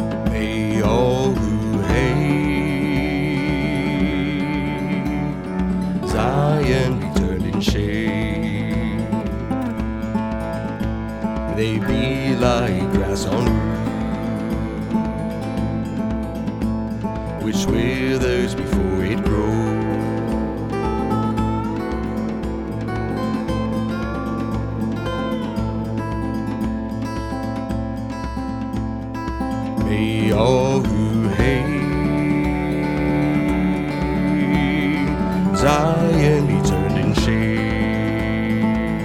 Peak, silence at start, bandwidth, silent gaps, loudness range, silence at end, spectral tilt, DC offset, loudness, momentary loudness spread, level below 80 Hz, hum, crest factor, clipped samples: 0 dBFS; 0 s; 16 kHz; none; 6 LU; 0 s; -7 dB/octave; under 0.1%; -21 LUFS; 7 LU; -30 dBFS; none; 20 dB; under 0.1%